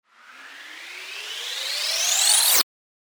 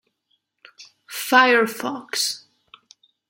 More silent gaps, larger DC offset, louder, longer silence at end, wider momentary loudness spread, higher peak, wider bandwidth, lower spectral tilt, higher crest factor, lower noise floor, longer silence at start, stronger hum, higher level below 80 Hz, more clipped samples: neither; neither; about the same, -19 LUFS vs -19 LUFS; second, 0.5 s vs 0.9 s; first, 22 LU vs 18 LU; about the same, -2 dBFS vs -2 dBFS; first, over 20 kHz vs 17 kHz; second, 4 dB/octave vs -1.5 dB/octave; about the same, 22 dB vs 22 dB; second, -46 dBFS vs -71 dBFS; second, 0.3 s vs 0.8 s; neither; about the same, -76 dBFS vs -78 dBFS; neither